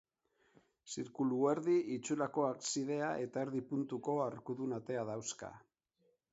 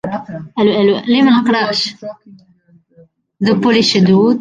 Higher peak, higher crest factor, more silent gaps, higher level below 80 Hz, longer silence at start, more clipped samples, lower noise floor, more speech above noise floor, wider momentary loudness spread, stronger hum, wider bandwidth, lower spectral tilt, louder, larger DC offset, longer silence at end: second, -20 dBFS vs -2 dBFS; first, 18 dB vs 12 dB; neither; second, -80 dBFS vs -56 dBFS; first, 0.85 s vs 0.05 s; neither; first, -78 dBFS vs -51 dBFS; about the same, 41 dB vs 38 dB; second, 11 LU vs 14 LU; neither; second, 8 kHz vs 9.4 kHz; about the same, -5.5 dB/octave vs -5.5 dB/octave; second, -38 LUFS vs -13 LUFS; neither; first, 0.75 s vs 0 s